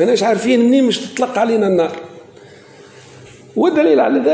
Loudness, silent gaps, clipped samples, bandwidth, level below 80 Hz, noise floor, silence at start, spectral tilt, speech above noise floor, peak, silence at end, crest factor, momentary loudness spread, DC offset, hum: -14 LUFS; none; under 0.1%; 8 kHz; -62 dBFS; -41 dBFS; 0 s; -5 dB/octave; 27 dB; -2 dBFS; 0 s; 12 dB; 8 LU; under 0.1%; none